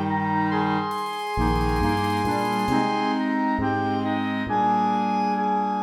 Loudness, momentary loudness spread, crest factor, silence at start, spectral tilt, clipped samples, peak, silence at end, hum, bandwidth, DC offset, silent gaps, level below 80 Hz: -24 LUFS; 3 LU; 14 dB; 0 s; -6.5 dB/octave; under 0.1%; -10 dBFS; 0 s; none; 16 kHz; under 0.1%; none; -38 dBFS